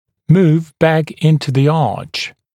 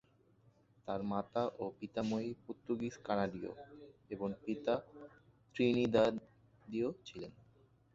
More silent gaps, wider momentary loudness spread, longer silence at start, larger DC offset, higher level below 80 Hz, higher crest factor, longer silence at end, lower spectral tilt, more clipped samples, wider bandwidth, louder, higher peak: neither; second, 10 LU vs 20 LU; second, 0.3 s vs 0.85 s; neither; first, -52 dBFS vs -70 dBFS; second, 14 dB vs 22 dB; second, 0.25 s vs 0.65 s; first, -7.5 dB/octave vs -5.5 dB/octave; neither; first, 10 kHz vs 7.6 kHz; first, -14 LUFS vs -38 LUFS; first, 0 dBFS vs -18 dBFS